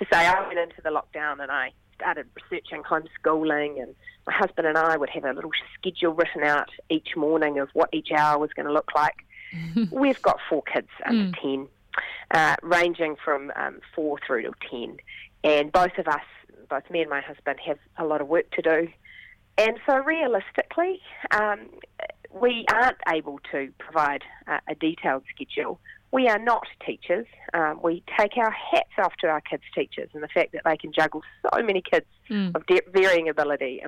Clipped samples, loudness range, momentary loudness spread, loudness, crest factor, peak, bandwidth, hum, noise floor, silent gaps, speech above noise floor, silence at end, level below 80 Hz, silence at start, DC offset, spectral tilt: under 0.1%; 3 LU; 12 LU; -25 LUFS; 18 dB; -6 dBFS; 15 kHz; none; -50 dBFS; none; 25 dB; 0 s; -60 dBFS; 0 s; under 0.1%; -5 dB/octave